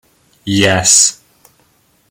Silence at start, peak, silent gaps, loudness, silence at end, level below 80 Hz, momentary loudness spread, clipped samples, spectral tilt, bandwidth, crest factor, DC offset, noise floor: 0.45 s; 0 dBFS; none; -10 LUFS; 0.95 s; -50 dBFS; 12 LU; under 0.1%; -2 dB/octave; over 20 kHz; 16 dB; under 0.1%; -55 dBFS